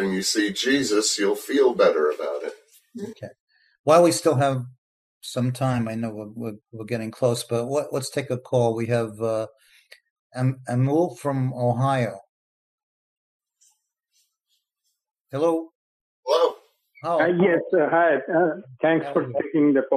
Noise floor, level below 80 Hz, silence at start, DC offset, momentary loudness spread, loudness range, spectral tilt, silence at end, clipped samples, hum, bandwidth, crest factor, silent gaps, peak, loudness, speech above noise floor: -77 dBFS; -68 dBFS; 0 s; under 0.1%; 17 LU; 7 LU; -5 dB/octave; 0 s; under 0.1%; none; 15 kHz; 18 dB; 3.40-3.47 s, 3.79-3.84 s, 4.78-5.21 s, 10.10-10.30 s, 12.29-13.40 s, 15.21-15.25 s, 15.75-16.23 s; -4 dBFS; -23 LUFS; 55 dB